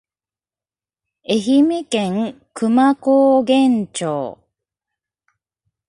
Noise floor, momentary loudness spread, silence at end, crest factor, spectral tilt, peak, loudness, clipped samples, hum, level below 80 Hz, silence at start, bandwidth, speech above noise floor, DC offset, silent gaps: under -90 dBFS; 11 LU; 1.55 s; 16 dB; -5.5 dB/octave; -2 dBFS; -17 LUFS; under 0.1%; none; -64 dBFS; 1.3 s; 11.5 kHz; over 74 dB; under 0.1%; none